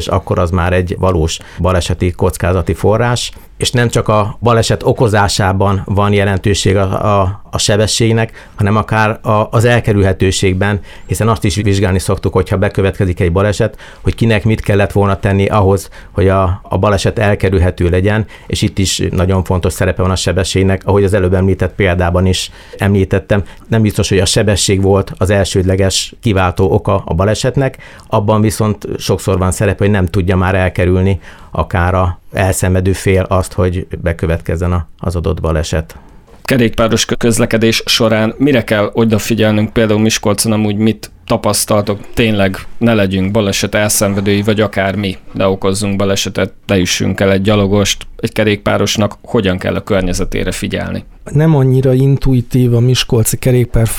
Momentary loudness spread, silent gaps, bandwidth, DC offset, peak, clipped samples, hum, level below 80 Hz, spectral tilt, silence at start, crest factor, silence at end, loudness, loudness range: 6 LU; none; 17 kHz; 0.3%; 0 dBFS; under 0.1%; none; -28 dBFS; -5.5 dB/octave; 0 s; 12 dB; 0 s; -13 LUFS; 2 LU